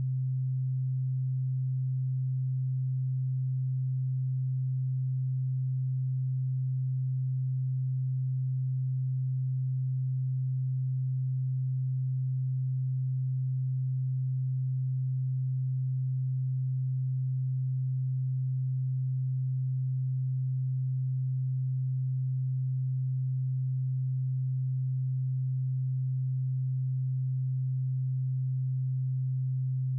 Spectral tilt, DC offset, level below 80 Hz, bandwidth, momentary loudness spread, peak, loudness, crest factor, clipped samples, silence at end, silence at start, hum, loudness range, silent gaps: -32.5 dB/octave; under 0.1%; under -90 dBFS; 0.2 kHz; 0 LU; -28 dBFS; -31 LUFS; 4 dB; under 0.1%; 0 s; 0 s; none; 0 LU; none